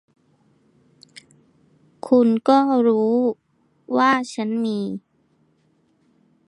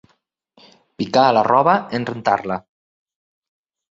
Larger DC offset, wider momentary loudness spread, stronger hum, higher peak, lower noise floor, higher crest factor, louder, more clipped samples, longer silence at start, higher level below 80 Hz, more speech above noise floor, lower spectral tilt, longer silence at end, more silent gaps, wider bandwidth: neither; about the same, 14 LU vs 13 LU; neither; about the same, -4 dBFS vs -2 dBFS; about the same, -63 dBFS vs -65 dBFS; about the same, 18 dB vs 20 dB; about the same, -19 LUFS vs -18 LUFS; neither; first, 2.05 s vs 1 s; second, -72 dBFS vs -62 dBFS; second, 45 dB vs 49 dB; about the same, -6 dB/octave vs -6 dB/octave; first, 1.5 s vs 1.35 s; neither; first, 11 kHz vs 7.8 kHz